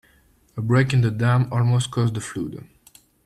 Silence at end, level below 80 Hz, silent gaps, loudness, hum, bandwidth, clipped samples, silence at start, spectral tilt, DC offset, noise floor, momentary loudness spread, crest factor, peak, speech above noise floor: 0.65 s; -54 dBFS; none; -21 LUFS; none; 12 kHz; under 0.1%; 0.55 s; -6.5 dB/octave; under 0.1%; -58 dBFS; 13 LU; 16 dB; -6 dBFS; 38 dB